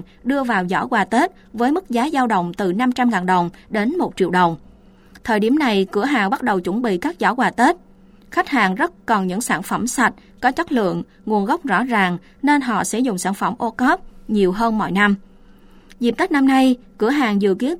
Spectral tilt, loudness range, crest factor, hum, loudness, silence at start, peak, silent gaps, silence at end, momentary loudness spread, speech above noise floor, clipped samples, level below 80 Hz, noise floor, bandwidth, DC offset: -5 dB/octave; 1 LU; 16 dB; none; -19 LUFS; 0 s; -2 dBFS; none; 0 s; 6 LU; 28 dB; under 0.1%; -48 dBFS; -46 dBFS; 16.5 kHz; under 0.1%